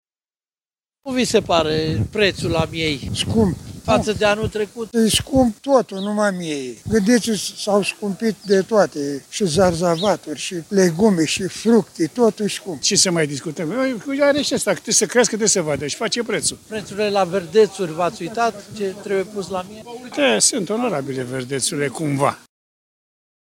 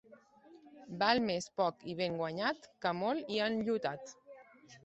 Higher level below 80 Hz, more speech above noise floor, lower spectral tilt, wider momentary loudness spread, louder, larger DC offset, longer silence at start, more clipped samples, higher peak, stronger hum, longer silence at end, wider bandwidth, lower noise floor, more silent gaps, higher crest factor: first, -46 dBFS vs -74 dBFS; first, over 71 dB vs 26 dB; about the same, -4 dB/octave vs -4.5 dB/octave; second, 10 LU vs 13 LU; first, -19 LUFS vs -35 LUFS; neither; first, 1.05 s vs 0.1 s; neither; first, -2 dBFS vs -14 dBFS; neither; first, 1.15 s vs 0.05 s; first, 16.5 kHz vs 8.2 kHz; first, under -90 dBFS vs -61 dBFS; neither; about the same, 18 dB vs 22 dB